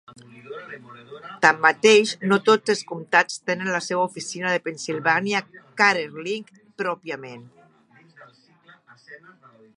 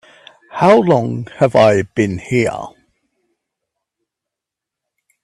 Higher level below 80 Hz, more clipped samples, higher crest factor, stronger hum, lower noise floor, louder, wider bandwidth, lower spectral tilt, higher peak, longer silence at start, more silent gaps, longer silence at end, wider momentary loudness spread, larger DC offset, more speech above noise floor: second, -76 dBFS vs -52 dBFS; neither; first, 24 dB vs 18 dB; neither; second, -56 dBFS vs -84 dBFS; second, -21 LUFS vs -14 LUFS; about the same, 11.5 kHz vs 12 kHz; second, -3.5 dB/octave vs -6.5 dB/octave; about the same, 0 dBFS vs 0 dBFS; second, 0.35 s vs 0.55 s; neither; second, 0.6 s vs 2.55 s; first, 22 LU vs 16 LU; neither; second, 34 dB vs 70 dB